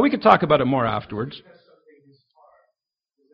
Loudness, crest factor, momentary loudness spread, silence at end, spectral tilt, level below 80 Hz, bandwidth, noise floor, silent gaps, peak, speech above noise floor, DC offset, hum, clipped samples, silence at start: -19 LUFS; 22 dB; 17 LU; 1.95 s; -4.5 dB/octave; -54 dBFS; 5.8 kHz; -79 dBFS; none; 0 dBFS; 60 dB; under 0.1%; none; under 0.1%; 0 s